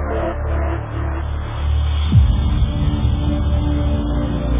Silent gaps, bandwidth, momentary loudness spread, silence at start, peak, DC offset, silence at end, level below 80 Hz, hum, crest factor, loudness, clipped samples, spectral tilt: none; 3.8 kHz; 8 LU; 0 s; -2 dBFS; under 0.1%; 0 s; -20 dBFS; none; 14 dB; -19 LUFS; under 0.1%; -11.5 dB/octave